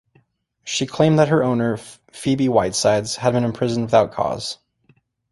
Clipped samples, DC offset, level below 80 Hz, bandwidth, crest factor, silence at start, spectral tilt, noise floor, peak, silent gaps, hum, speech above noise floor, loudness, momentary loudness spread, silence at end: under 0.1%; under 0.1%; -52 dBFS; 11.5 kHz; 18 dB; 0.65 s; -5.5 dB/octave; -61 dBFS; -2 dBFS; none; none; 42 dB; -19 LUFS; 13 LU; 0.8 s